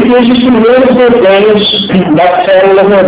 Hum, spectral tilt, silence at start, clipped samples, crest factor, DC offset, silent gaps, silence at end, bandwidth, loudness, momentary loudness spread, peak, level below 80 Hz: none; -9.5 dB/octave; 0 s; 9%; 4 dB; under 0.1%; none; 0 s; 4 kHz; -5 LUFS; 2 LU; 0 dBFS; -38 dBFS